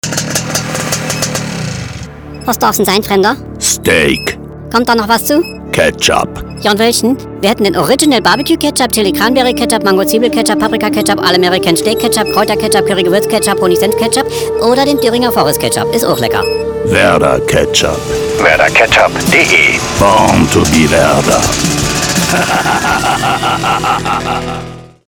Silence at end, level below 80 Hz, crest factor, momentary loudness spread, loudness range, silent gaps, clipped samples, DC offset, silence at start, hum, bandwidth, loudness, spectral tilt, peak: 0.2 s; -32 dBFS; 10 dB; 7 LU; 4 LU; none; 0.1%; under 0.1%; 0.05 s; none; over 20 kHz; -10 LUFS; -3.5 dB/octave; 0 dBFS